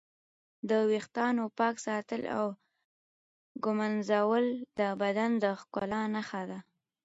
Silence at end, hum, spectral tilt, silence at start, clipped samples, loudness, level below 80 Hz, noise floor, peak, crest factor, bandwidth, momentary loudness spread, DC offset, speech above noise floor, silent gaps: 0.45 s; none; -5.5 dB/octave; 0.65 s; under 0.1%; -32 LUFS; -74 dBFS; under -90 dBFS; -16 dBFS; 18 dB; 8 kHz; 10 LU; under 0.1%; over 59 dB; 2.85-3.55 s